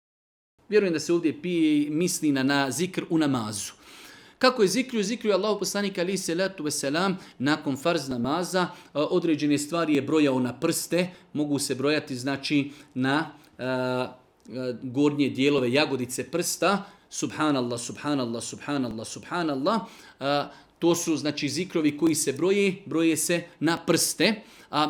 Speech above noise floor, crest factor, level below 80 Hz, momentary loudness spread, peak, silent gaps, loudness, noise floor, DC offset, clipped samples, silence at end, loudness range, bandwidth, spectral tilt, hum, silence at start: 23 dB; 20 dB; -66 dBFS; 9 LU; -6 dBFS; none; -26 LUFS; -49 dBFS; under 0.1%; under 0.1%; 0 s; 3 LU; 18.5 kHz; -4 dB/octave; none; 0.7 s